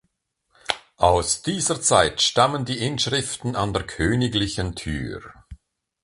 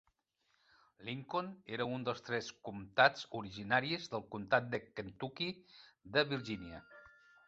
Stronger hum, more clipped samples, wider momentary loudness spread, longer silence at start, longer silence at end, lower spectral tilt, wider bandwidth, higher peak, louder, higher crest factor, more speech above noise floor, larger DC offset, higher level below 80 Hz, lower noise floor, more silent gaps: neither; neither; second, 11 LU vs 16 LU; second, 0.7 s vs 1 s; about the same, 0.5 s vs 0.4 s; about the same, -3.5 dB/octave vs -2.5 dB/octave; first, 11.5 kHz vs 8 kHz; first, -2 dBFS vs -12 dBFS; first, -22 LUFS vs -37 LUFS; about the same, 22 dB vs 26 dB; first, 51 dB vs 42 dB; neither; first, -40 dBFS vs -70 dBFS; second, -73 dBFS vs -80 dBFS; neither